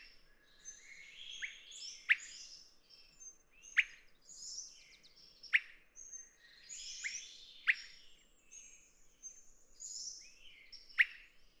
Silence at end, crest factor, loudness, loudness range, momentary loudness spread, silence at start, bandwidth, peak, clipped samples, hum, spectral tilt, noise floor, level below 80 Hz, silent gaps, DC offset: 0.15 s; 28 dB; -38 LUFS; 3 LU; 25 LU; 0 s; over 20 kHz; -16 dBFS; under 0.1%; none; 3.5 dB/octave; -64 dBFS; -72 dBFS; none; under 0.1%